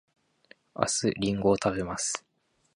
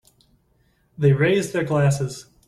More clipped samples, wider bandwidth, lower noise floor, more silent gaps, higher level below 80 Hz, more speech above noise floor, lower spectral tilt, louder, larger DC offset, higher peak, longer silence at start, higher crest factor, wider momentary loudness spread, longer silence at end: neither; about the same, 11.5 kHz vs 12.5 kHz; about the same, -60 dBFS vs -63 dBFS; neither; about the same, -56 dBFS vs -54 dBFS; second, 33 dB vs 44 dB; second, -4 dB/octave vs -6.5 dB/octave; second, -28 LUFS vs -21 LUFS; neither; about the same, -6 dBFS vs -6 dBFS; second, 0.75 s vs 1 s; first, 24 dB vs 16 dB; about the same, 8 LU vs 7 LU; first, 0.55 s vs 0.25 s